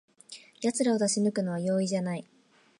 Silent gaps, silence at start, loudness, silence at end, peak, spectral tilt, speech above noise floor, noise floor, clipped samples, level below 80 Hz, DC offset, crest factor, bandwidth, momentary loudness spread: none; 0.3 s; -29 LUFS; 0.6 s; -14 dBFS; -5 dB/octave; 23 dB; -51 dBFS; under 0.1%; -78 dBFS; under 0.1%; 16 dB; 11.5 kHz; 20 LU